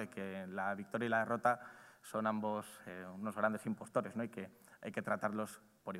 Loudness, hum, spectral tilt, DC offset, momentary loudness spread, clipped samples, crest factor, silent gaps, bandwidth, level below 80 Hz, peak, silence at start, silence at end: -40 LUFS; none; -6 dB/octave; under 0.1%; 15 LU; under 0.1%; 20 dB; none; 16 kHz; -86 dBFS; -20 dBFS; 0 s; 0 s